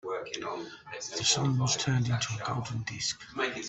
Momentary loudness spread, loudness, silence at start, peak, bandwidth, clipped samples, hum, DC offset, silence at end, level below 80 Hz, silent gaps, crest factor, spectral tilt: 11 LU; -31 LUFS; 0.05 s; -12 dBFS; 8.4 kHz; under 0.1%; none; under 0.1%; 0 s; -62 dBFS; none; 20 dB; -3.5 dB/octave